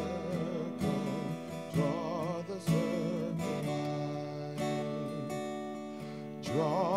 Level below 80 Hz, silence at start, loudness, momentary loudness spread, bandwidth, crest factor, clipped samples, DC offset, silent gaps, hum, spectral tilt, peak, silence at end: -64 dBFS; 0 s; -35 LUFS; 9 LU; 15.5 kHz; 16 dB; under 0.1%; under 0.1%; none; none; -7 dB/octave; -18 dBFS; 0 s